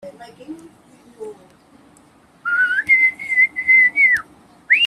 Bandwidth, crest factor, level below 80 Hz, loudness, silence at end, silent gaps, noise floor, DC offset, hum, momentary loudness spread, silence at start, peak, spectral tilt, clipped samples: 13 kHz; 16 dB; -64 dBFS; -14 LUFS; 0 s; none; -51 dBFS; under 0.1%; none; 25 LU; 0.05 s; -4 dBFS; -1.5 dB/octave; under 0.1%